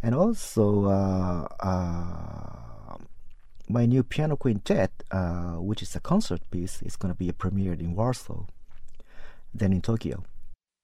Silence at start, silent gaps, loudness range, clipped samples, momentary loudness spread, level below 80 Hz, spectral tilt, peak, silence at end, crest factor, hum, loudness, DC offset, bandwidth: 0 s; none; 4 LU; under 0.1%; 18 LU; -42 dBFS; -7.5 dB/octave; -10 dBFS; 0.3 s; 18 dB; none; -28 LUFS; under 0.1%; 13.5 kHz